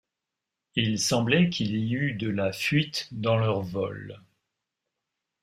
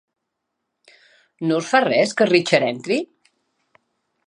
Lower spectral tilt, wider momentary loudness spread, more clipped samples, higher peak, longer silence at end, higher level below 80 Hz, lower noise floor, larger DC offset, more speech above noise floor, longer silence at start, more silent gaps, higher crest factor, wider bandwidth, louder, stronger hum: about the same, -5 dB/octave vs -4.5 dB/octave; about the same, 9 LU vs 8 LU; neither; second, -8 dBFS vs 0 dBFS; about the same, 1.25 s vs 1.25 s; first, -62 dBFS vs -74 dBFS; first, -86 dBFS vs -78 dBFS; neither; about the same, 60 dB vs 60 dB; second, 0.75 s vs 1.4 s; neither; about the same, 20 dB vs 22 dB; first, 15.5 kHz vs 10.5 kHz; second, -26 LUFS vs -19 LUFS; neither